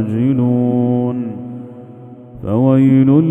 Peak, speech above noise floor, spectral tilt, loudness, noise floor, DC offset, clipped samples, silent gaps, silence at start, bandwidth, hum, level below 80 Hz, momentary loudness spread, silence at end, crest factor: 0 dBFS; 24 dB; -11.5 dB/octave; -14 LUFS; -36 dBFS; under 0.1%; under 0.1%; none; 0 s; 3.6 kHz; none; -50 dBFS; 20 LU; 0 s; 14 dB